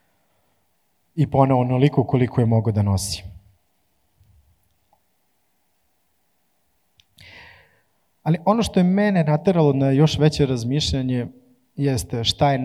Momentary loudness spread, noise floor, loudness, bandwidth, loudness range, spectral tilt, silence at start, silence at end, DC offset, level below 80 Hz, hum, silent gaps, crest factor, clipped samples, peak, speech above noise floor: 9 LU; -69 dBFS; -20 LUFS; 13.5 kHz; 10 LU; -6.5 dB/octave; 1.15 s; 0 s; under 0.1%; -48 dBFS; none; none; 20 dB; under 0.1%; -2 dBFS; 50 dB